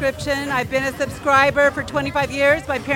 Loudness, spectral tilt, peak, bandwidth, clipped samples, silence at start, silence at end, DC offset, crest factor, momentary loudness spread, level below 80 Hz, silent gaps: -19 LUFS; -4.5 dB/octave; -2 dBFS; 17 kHz; under 0.1%; 0 s; 0 s; under 0.1%; 18 dB; 8 LU; -42 dBFS; none